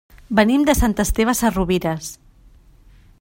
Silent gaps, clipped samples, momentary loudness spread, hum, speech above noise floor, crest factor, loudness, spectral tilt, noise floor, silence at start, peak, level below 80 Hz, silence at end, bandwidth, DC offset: none; under 0.1%; 10 LU; none; 31 dB; 18 dB; -18 LUFS; -5 dB/octave; -49 dBFS; 0.3 s; -2 dBFS; -30 dBFS; 1.05 s; 16.5 kHz; under 0.1%